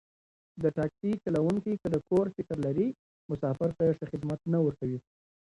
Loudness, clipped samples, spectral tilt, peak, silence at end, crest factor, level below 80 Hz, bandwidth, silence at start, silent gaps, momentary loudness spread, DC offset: -31 LUFS; under 0.1%; -9.5 dB/octave; -14 dBFS; 0.5 s; 16 dB; -60 dBFS; 11 kHz; 0.55 s; 2.99-3.29 s; 7 LU; under 0.1%